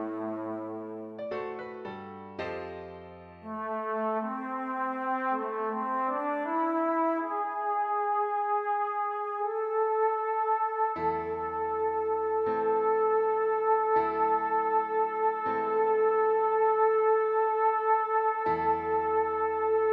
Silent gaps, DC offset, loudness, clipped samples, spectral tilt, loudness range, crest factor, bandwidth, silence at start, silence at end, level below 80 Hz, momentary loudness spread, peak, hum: none; under 0.1%; -29 LUFS; under 0.1%; -8 dB/octave; 9 LU; 14 dB; 4.7 kHz; 0 s; 0 s; -66 dBFS; 12 LU; -14 dBFS; none